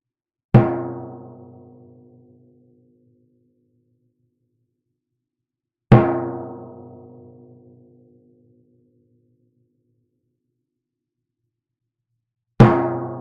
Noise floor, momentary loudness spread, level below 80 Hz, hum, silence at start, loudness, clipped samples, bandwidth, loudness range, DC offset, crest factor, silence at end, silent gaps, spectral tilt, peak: -85 dBFS; 27 LU; -44 dBFS; none; 0.55 s; -17 LUFS; under 0.1%; 5.8 kHz; 17 LU; under 0.1%; 24 dB; 0 s; none; -8.5 dB/octave; 0 dBFS